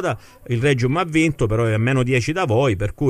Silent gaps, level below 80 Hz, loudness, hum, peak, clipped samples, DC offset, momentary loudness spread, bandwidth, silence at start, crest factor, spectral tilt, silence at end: none; -40 dBFS; -19 LUFS; none; -6 dBFS; under 0.1%; under 0.1%; 5 LU; 13 kHz; 0 s; 14 dB; -6.5 dB/octave; 0 s